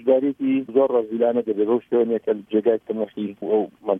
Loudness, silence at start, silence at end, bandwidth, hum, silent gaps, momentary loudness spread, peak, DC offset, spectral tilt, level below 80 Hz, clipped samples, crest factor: -22 LUFS; 0 s; 0 s; 3.7 kHz; none; none; 6 LU; -6 dBFS; under 0.1%; -9.5 dB/octave; -72 dBFS; under 0.1%; 16 dB